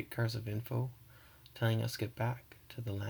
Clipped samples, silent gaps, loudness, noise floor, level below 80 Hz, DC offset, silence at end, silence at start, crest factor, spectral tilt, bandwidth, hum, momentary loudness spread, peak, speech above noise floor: under 0.1%; none; -38 LUFS; -59 dBFS; -66 dBFS; under 0.1%; 0 s; 0 s; 18 dB; -6 dB/octave; over 20 kHz; none; 21 LU; -20 dBFS; 22 dB